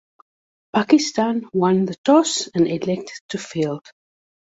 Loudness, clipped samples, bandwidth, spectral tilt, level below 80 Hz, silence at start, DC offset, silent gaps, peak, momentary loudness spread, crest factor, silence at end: -20 LUFS; under 0.1%; 8 kHz; -5 dB/octave; -62 dBFS; 0.75 s; under 0.1%; 1.98-2.04 s, 3.21-3.29 s; -2 dBFS; 12 LU; 18 dB; 0.7 s